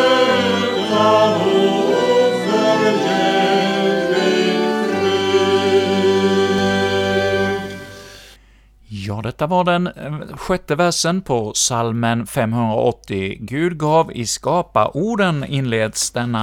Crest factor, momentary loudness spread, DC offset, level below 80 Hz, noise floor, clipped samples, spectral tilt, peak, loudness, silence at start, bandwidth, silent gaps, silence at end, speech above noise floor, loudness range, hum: 16 dB; 9 LU; under 0.1%; -48 dBFS; -49 dBFS; under 0.1%; -4.5 dB/octave; -2 dBFS; -17 LUFS; 0 s; 16.5 kHz; none; 0 s; 30 dB; 6 LU; none